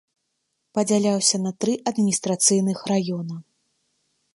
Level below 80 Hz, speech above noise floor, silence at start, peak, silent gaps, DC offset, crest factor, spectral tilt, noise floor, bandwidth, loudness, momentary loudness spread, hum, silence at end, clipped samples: -70 dBFS; 54 dB; 0.75 s; -4 dBFS; none; under 0.1%; 20 dB; -4 dB/octave; -76 dBFS; 11.5 kHz; -22 LUFS; 11 LU; none; 0.95 s; under 0.1%